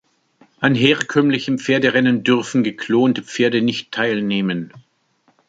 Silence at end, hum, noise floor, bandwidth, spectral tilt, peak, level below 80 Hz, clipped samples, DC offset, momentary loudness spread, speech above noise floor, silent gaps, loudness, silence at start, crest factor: 0.7 s; none; -62 dBFS; 8 kHz; -5.5 dB/octave; 0 dBFS; -62 dBFS; under 0.1%; under 0.1%; 6 LU; 44 dB; none; -18 LUFS; 0.6 s; 18 dB